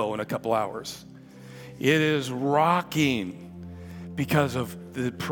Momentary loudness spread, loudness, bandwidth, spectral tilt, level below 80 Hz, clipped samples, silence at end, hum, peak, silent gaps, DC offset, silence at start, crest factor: 20 LU; -26 LUFS; 18 kHz; -5.5 dB/octave; -62 dBFS; under 0.1%; 0 s; none; -6 dBFS; none; under 0.1%; 0 s; 22 dB